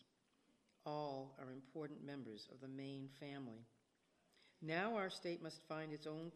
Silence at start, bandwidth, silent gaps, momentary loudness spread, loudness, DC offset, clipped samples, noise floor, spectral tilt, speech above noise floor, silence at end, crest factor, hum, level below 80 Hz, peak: 0.85 s; 13 kHz; none; 12 LU; -49 LUFS; under 0.1%; under 0.1%; -81 dBFS; -6 dB/octave; 32 dB; 0 s; 24 dB; none; under -90 dBFS; -26 dBFS